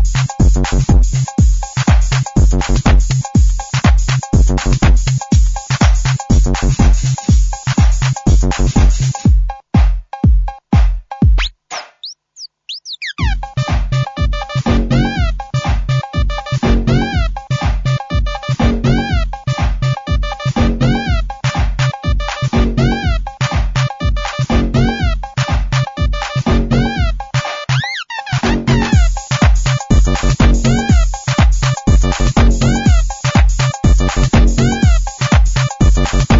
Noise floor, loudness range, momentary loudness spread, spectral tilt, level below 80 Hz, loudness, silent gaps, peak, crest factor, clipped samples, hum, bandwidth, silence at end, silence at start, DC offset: -37 dBFS; 4 LU; 6 LU; -5.5 dB/octave; -14 dBFS; -15 LUFS; none; -2 dBFS; 12 dB; under 0.1%; none; 7.8 kHz; 0 s; 0 s; under 0.1%